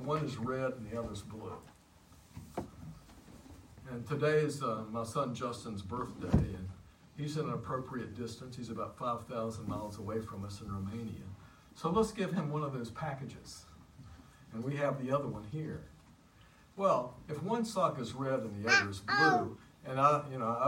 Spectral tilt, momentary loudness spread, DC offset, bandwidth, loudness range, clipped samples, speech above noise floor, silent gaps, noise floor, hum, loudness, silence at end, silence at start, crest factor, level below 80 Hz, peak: -5.5 dB/octave; 23 LU; under 0.1%; 16 kHz; 9 LU; under 0.1%; 26 dB; none; -61 dBFS; none; -35 LUFS; 0 s; 0 s; 22 dB; -56 dBFS; -14 dBFS